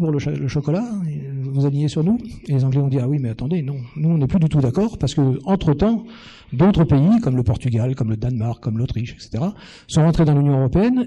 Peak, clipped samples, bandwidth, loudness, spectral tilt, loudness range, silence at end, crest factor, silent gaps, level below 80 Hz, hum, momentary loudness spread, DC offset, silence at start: -6 dBFS; under 0.1%; 9.6 kHz; -19 LUFS; -8.5 dB/octave; 3 LU; 0 s; 12 dB; none; -38 dBFS; none; 10 LU; under 0.1%; 0 s